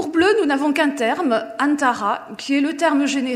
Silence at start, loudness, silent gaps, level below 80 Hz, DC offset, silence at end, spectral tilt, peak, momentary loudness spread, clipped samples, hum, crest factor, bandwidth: 0 s; -19 LUFS; none; -62 dBFS; under 0.1%; 0 s; -3.5 dB/octave; -4 dBFS; 6 LU; under 0.1%; none; 16 dB; 14.5 kHz